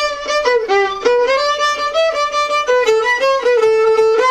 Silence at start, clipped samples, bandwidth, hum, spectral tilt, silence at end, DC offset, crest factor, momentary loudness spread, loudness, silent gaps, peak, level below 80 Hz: 0 s; under 0.1%; 12 kHz; none; -1 dB/octave; 0 s; under 0.1%; 12 dB; 3 LU; -14 LUFS; none; -2 dBFS; -48 dBFS